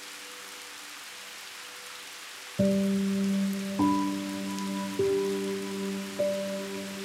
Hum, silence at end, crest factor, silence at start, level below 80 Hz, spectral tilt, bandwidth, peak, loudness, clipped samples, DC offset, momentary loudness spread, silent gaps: none; 0 s; 18 dB; 0 s; -68 dBFS; -5.5 dB/octave; 16.5 kHz; -14 dBFS; -31 LUFS; under 0.1%; under 0.1%; 14 LU; none